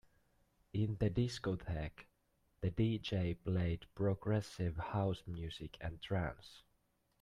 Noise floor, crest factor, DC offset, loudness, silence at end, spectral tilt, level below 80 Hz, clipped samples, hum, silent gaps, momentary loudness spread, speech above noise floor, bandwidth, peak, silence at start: -78 dBFS; 18 dB; under 0.1%; -40 LUFS; 0.6 s; -7.5 dB/octave; -56 dBFS; under 0.1%; none; none; 10 LU; 40 dB; 11 kHz; -22 dBFS; 0.75 s